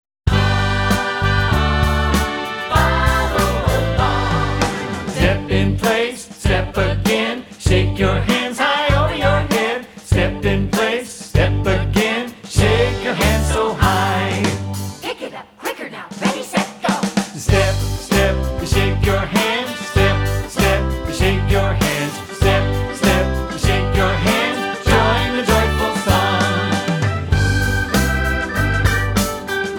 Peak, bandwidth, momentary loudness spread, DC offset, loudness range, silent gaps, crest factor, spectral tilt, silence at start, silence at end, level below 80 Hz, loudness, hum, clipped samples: -2 dBFS; 19 kHz; 6 LU; under 0.1%; 3 LU; none; 16 dB; -5 dB/octave; 0.25 s; 0 s; -24 dBFS; -17 LUFS; none; under 0.1%